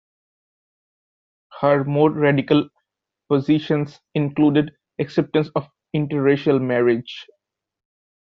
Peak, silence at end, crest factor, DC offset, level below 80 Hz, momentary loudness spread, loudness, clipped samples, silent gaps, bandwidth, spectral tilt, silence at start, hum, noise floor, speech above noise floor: -4 dBFS; 1 s; 18 dB; under 0.1%; -62 dBFS; 11 LU; -20 LUFS; under 0.1%; none; 6.4 kHz; -6 dB/octave; 1.55 s; none; -79 dBFS; 60 dB